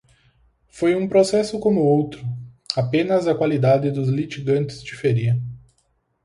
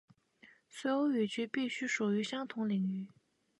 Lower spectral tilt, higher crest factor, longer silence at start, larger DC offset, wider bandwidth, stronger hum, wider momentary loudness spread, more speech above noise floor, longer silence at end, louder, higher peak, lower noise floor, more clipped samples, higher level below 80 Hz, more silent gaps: first, -7 dB/octave vs -5 dB/octave; about the same, 18 dB vs 14 dB; first, 0.75 s vs 0.45 s; neither; about the same, 11.5 kHz vs 11.5 kHz; neither; about the same, 11 LU vs 9 LU; first, 48 dB vs 30 dB; about the same, 0.65 s vs 0.55 s; first, -20 LUFS vs -35 LUFS; first, -2 dBFS vs -22 dBFS; about the same, -67 dBFS vs -64 dBFS; neither; first, -54 dBFS vs -84 dBFS; neither